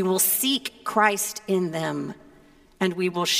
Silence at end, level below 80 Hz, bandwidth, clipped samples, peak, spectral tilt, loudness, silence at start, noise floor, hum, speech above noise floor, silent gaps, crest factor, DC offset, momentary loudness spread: 0 s; -64 dBFS; 16 kHz; under 0.1%; -4 dBFS; -3 dB/octave; -24 LUFS; 0 s; -54 dBFS; none; 30 dB; none; 20 dB; under 0.1%; 9 LU